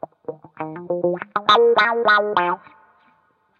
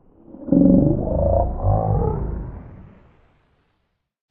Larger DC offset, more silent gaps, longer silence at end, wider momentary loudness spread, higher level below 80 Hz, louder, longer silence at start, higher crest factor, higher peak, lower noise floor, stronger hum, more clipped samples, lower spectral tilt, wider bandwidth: neither; neither; second, 1 s vs 1.45 s; about the same, 19 LU vs 20 LU; second, -72 dBFS vs -30 dBFS; about the same, -18 LUFS vs -19 LUFS; about the same, 0.3 s vs 0.35 s; about the same, 18 dB vs 18 dB; about the same, -2 dBFS vs -2 dBFS; second, -61 dBFS vs -71 dBFS; neither; neither; second, -5 dB/octave vs -14.5 dB/octave; first, 6.8 kHz vs 2.3 kHz